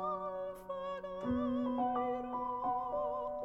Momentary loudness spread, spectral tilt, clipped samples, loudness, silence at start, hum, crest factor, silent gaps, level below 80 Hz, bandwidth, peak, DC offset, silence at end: 7 LU; -8 dB/octave; under 0.1%; -38 LUFS; 0 s; none; 12 dB; none; -62 dBFS; 12.5 kHz; -24 dBFS; under 0.1%; 0 s